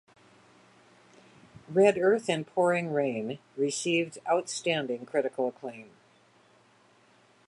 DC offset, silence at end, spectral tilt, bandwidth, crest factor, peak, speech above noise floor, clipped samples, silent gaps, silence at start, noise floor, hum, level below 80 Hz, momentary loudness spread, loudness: under 0.1%; 1.65 s; -4.5 dB/octave; 11.5 kHz; 20 dB; -10 dBFS; 34 dB; under 0.1%; none; 1.7 s; -62 dBFS; none; -78 dBFS; 11 LU; -28 LUFS